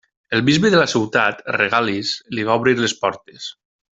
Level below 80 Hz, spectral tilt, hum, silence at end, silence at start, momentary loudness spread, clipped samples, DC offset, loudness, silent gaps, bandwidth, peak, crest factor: -56 dBFS; -4.5 dB/octave; none; 0.45 s; 0.3 s; 14 LU; under 0.1%; under 0.1%; -18 LUFS; none; 8 kHz; -2 dBFS; 18 dB